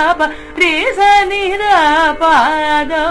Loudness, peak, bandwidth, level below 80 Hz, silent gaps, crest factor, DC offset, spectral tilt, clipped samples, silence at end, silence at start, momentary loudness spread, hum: -11 LUFS; 0 dBFS; 11 kHz; -36 dBFS; none; 12 dB; under 0.1%; -2.5 dB/octave; under 0.1%; 0 s; 0 s; 5 LU; none